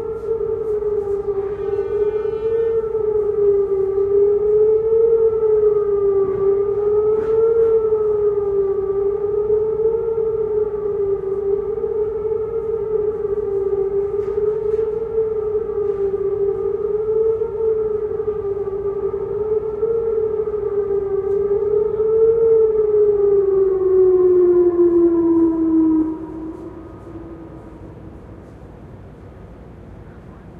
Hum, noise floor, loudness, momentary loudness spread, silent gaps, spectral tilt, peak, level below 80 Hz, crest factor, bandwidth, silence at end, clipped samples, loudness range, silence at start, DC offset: none; -38 dBFS; -18 LUFS; 8 LU; none; -10.5 dB/octave; -6 dBFS; -44 dBFS; 12 dB; 2.9 kHz; 0 s; under 0.1%; 6 LU; 0 s; under 0.1%